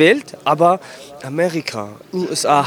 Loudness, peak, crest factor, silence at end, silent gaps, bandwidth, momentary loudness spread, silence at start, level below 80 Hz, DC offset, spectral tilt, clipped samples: -18 LUFS; -2 dBFS; 16 dB; 0 s; none; 19.5 kHz; 14 LU; 0 s; -68 dBFS; under 0.1%; -4.5 dB/octave; under 0.1%